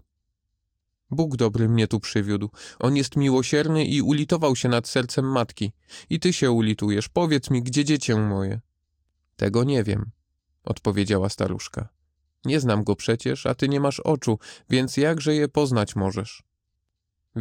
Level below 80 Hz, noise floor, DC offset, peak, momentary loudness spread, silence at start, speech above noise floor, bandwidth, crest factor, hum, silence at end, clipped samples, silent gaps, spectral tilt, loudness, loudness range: -52 dBFS; -78 dBFS; under 0.1%; -8 dBFS; 10 LU; 1.1 s; 56 dB; 15.5 kHz; 16 dB; none; 0 s; under 0.1%; none; -6 dB/octave; -23 LUFS; 4 LU